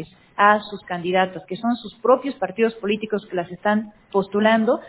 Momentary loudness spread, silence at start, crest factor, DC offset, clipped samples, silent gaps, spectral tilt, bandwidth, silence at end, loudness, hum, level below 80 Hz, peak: 10 LU; 0 s; 20 dB; under 0.1%; under 0.1%; none; -9.5 dB/octave; 4 kHz; 0 s; -21 LUFS; none; -62 dBFS; -2 dBFS